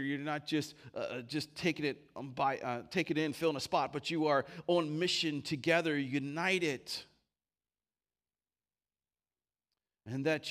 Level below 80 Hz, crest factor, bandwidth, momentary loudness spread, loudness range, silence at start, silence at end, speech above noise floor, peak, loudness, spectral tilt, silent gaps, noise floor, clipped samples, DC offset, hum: -76 dBFS; 20 dB; 15.5 kHz; 9 LU; 10 LU; 0 s; 0 s; over 55 dB; -16 dBFS; -35 LUFS; -4.5 dB/octave; none; under -90 dBFS; under 0.1%; under 0.1%; none